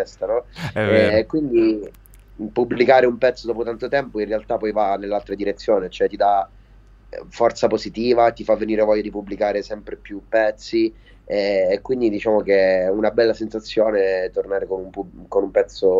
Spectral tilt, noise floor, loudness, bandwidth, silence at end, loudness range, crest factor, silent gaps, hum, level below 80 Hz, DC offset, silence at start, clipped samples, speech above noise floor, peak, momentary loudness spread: -6 dB/octave; -47 dBFS; -20 LUFS; 7.6 kHz; 0 s; 3 LU; 20 dB; none; none; -46 dBFS; under 0.1%; 0 s; under 0.1%; 28 dB; 0 dBFS; 11 LU